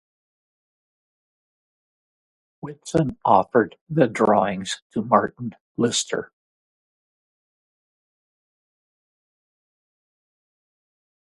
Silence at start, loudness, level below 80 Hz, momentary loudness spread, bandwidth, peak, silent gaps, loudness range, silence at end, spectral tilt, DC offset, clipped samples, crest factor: 2.65 s; -22 LUFS; -60 dBFS; 15 LU; 11.5 kHz; 0 dBFS; 3.81-3.86 s, 4.82-4.90 s, 5.61-5.75 s; 9 LU; 5.1 s; -5 dB/octave; under 0.1%; under 0.1%; 26 dB